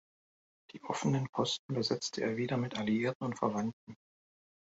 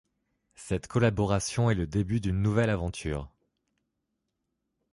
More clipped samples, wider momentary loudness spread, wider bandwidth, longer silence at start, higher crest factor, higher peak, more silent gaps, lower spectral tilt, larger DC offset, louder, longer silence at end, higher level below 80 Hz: neither; second, 7 LU vs 10 LU; second, 8 kHz vs 11.5 kHz; first, 0.75 s vs 0.6 s; about the same, 20 dB vs 18 dB; second, -16 dBFS vs -12 dBFS; first, 1.29-1.33 s, 1.59-1.69 s, 3.15-3.20 s, 3.73-3.87 s vs none; about the same, -5 dB/octave vs -6 dB/octave; neither; second, -34 LUFS vs -29 LUFS; second, 0.75 s vs 1.65 s; second, -72 dBFS vs -46 dBFS